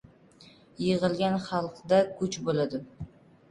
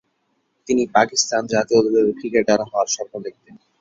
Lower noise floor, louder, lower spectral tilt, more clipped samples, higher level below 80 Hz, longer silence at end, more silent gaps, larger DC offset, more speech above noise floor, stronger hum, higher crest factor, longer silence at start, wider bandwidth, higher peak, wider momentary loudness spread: second, -56 dBFS vs -69 dBFS; second, -28 LUFS vs -19 LUFS; first, -6 dB/octave vs -3 dB/octave; neither; about the same, -60 dBFS vs -60 dBFS; first, 0.45 s vs 0.25 s; neither; neither; second, 28 dB vs 50 dB; neither; about the same, 18 dB vs 18 dB; second, 0.4 s vs 0.7 s; first, 11 kHz vs 7.8 kHz; second, -10 dBFS vs -2 dBFS; first, 16 LU vs 9 LU